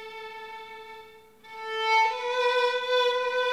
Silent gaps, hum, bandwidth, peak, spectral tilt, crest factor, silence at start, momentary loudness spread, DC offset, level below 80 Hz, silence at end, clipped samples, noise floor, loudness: none; none; 13.5 kHz; -12 dBFS; 0.5 dB/octave; 16 dB; 0 s; 20 LU; under 0.1%; -72 dBFS; 0 s; under 0.1%; -51 dBFS; -25 LUFS